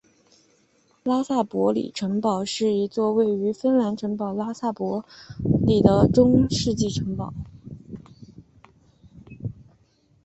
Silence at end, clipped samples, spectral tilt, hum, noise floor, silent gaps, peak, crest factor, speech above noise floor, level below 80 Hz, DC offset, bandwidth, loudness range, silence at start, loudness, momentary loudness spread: 0.7 s; under 0.1%; -7 dB/octave; none; -63 dBFS; none; -2 dBFS; 22 dB; 41 dB; -46 dBFS; under 0.1%; 8.4 kHz; 9 LU; 1.05 s; -23 LUFS; 20 LU